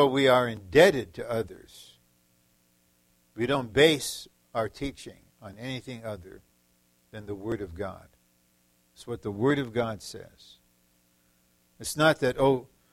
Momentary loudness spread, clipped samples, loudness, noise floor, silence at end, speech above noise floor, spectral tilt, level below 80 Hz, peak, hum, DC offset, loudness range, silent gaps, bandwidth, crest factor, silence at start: 24 LU; under 0.1%; -27 LUFS; -67 dBFS; 0.3 s; 40 dB; -4.5 dB/octave; -56 dBFS; -6 dBFS; 60 Hz at -65 dBFS; under 0.1%; 11 LU; none; 16 kHz; 24 dB; 0 s